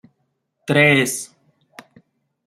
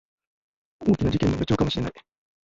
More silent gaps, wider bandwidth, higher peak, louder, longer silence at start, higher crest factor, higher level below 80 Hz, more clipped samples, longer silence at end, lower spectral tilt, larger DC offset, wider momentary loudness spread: neither; first, 15.5 kHz vs 7.8 kHz; first, -2 dBFS vs -8 dBFS; first, -16 LUFS vs -24 LUFS; second, 0.65 s vs 0.8 s; about the same, 20 dB vs 18 dB; second, -62 dBFS vs -42 dBFS; neither; first, 1.2 s vs 0.45 s; second, -4 dB/octave vs -7 dB/octave; neither; first, 22 LU vs 7 LU